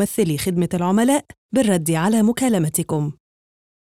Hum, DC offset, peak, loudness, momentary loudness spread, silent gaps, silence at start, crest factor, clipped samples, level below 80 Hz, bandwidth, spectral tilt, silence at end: none; 0.2%; -6 dBFS; -19 LUFS; 6 LU; 1.37-1.49 s; 0 s; 14 dB; under 0.1%; -54 dBFS; 16.5 kHz; -5.5 dB/octave; 0.8 s